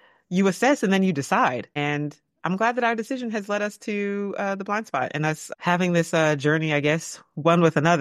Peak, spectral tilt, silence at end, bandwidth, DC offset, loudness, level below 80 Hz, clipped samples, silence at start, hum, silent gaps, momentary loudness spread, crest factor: -4 dBFS; -5.5 dB/octave; 0 s; 14 kHz; under 0.1%; -23 LUFS; -68 dBFS; under 0.1%; 0.3 s; none; none; 8 LU; 20 dB